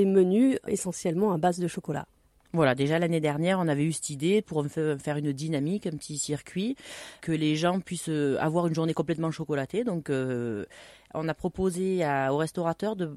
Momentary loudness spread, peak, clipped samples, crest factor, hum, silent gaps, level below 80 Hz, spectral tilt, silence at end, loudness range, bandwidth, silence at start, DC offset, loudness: 9 LU; -10 dBFS; under 0.1%; 18 dB; none; none; -60 dBFS; -6 dB/octave; 0 s; 3 LU; 13.5 kHz; 0 s; under 0.1%; -28 LUFS